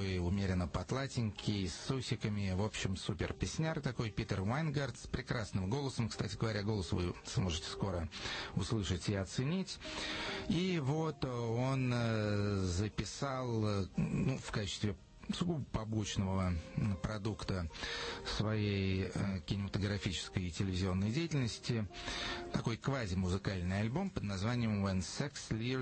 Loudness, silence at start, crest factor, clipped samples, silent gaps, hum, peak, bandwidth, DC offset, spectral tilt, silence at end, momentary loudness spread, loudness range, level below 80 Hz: -38 LUFS; 0 s; 16 dB; under 0.1%; none; none; -22 dBFS; 8.4 kHz; under 0.1%; -5.5 dB/octave; 0 s; 5 LU; 2 LU; -54 dBFS